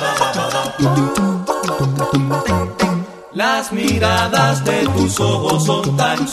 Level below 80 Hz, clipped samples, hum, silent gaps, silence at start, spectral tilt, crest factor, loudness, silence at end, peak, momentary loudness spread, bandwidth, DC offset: -42 dBFS; under 0.1%; none; none; 0 s; -5 dB/octave; 16 dB; -16 LUFS; 0 s; 0 dBFS; 5 LU; 14 kHz; under 0.1%